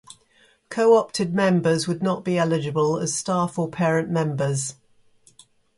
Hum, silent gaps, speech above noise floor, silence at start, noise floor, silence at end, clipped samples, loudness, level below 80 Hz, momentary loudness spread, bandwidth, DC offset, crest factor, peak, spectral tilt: none; none; 38 dB; 0.7 s; -59 dBFS; 1.05 s; under 0.1%; -22 LUFS; -64 dBFS; 7 LU; 11.5 kHz; under 0.1%; 18 dB; -6 dBFS; -5.5 dB/octave